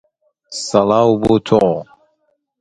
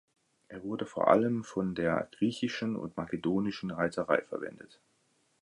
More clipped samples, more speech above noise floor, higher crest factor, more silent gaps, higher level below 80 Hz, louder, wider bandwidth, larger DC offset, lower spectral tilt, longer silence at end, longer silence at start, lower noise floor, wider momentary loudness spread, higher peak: neither; first, 51 dB vs 41 dB; second, 16 dB vs 22 dB; neither; first, -46 dBFS vs -64 dBFS; first, -15 LUFS vs -32 LUFS; about the same, 10.5 kHz vs 11 kHz; neither; about the same, -6 dB/octave vs -6.5 dB/octave; about the same, 0.75 s vs 0.75 s; about the same, 0.5 s vs 0.5 s; second, -65 dBFS vs -72 dBFS; about the same, 12 LU vs 14 LU; first, 0 dBFS vs -10 dBFS